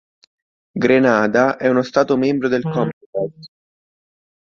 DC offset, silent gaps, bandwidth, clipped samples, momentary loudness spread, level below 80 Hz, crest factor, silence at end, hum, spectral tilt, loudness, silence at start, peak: under 0.1%; 2.93-3.13 s; 7 kHz; under 0.1%; 11 LU; -58 dBFS; 18 dB; 0.95 s; none; -6.5 dB/octave; -17 LUFS; 0.75 s; -2 dBFS